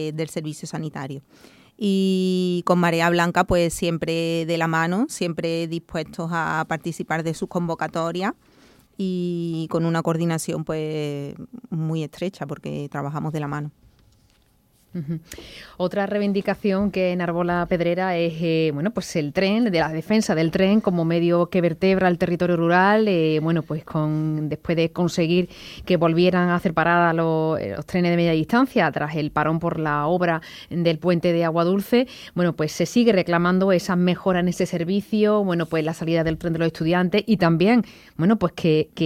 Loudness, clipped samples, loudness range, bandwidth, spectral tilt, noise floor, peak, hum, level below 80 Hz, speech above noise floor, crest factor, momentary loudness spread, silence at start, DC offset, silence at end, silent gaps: -22 LUFS; under 0.1%; 7 LU; 15 kHz; -6.5 dB/octave; -60 dBFS; -4 dBFS; none; -50 dBFS; 39 dB; 18 dB; 11 LU; 0 s; under 0.1%; 0 s; none